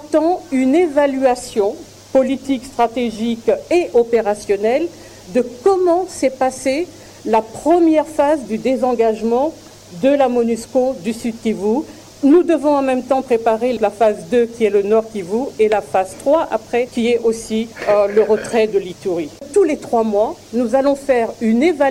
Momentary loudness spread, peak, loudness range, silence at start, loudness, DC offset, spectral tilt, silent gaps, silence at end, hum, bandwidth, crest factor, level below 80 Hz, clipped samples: 7 LU; -4 dBFS; 2 LU; 0 s; -17 LUFS; under 0.1%; -5 dB/octave; none; 0 s; none; 16 kHz; 12 dB; -50 dBFS; under 0.1%